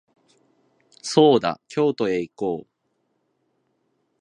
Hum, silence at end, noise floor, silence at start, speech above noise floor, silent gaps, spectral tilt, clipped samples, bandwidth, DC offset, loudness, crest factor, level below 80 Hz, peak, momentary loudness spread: none; 1.6 s; -72 dBFS; 1.05 s; 52 dB; none; -5.5 dB/octave; under 0.1%; 10.5 kHz; under 0.1%; -21 LUFS; 22 dB; -66 dBFS; -2 dBFS; 13 LU